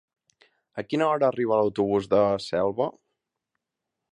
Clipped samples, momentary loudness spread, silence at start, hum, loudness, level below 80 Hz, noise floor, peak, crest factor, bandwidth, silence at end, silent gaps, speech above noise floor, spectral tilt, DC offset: under 0.1%; 8 LU; 0.75 s; none; -24 LUFS; -62 dBFS; -85 dBFS; -8 dBFS; 18 dB; 10.5 kHz; 1.25 s; none; 61 dB; -6.5 dB/octave; under 0.1%